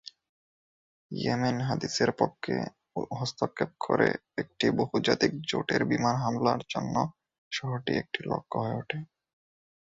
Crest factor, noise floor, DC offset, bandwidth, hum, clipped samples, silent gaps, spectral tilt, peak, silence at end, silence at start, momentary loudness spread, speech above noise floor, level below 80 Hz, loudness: 22 dB; under -90 dBFS; under 0.1%; 7.8 kHz; none; under 0.1%; 0.29-1.10 s, 7.38-7.51 s; -5.5 dB/octave; -8 dBFS; 0.85 s; 0.05 s; 10 LU; over 61 dB; -62 dBFS; -30 LUFS